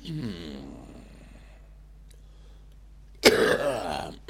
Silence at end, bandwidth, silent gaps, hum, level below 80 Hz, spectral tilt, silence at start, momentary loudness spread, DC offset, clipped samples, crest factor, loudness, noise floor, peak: 0.1 s; 16.5 kHz; none; none; -48 dBFS; -3.5 dB/octave; 0 s; 26 LU; under 0.1%; under 0.1%; 26 dB; -24 LUFS; -49 dBFS; -4 dBFS